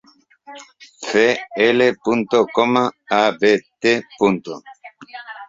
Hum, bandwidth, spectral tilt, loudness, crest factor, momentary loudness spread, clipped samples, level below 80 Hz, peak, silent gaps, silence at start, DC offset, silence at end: none; 7.8 kHz; -4.5 dB/octave; -17 LUFS; 18 dB; 18 LU; under 0.1%; -60 dBFS; -2 dBFS; none; 0.5 s; under 0.1%; 0.05 s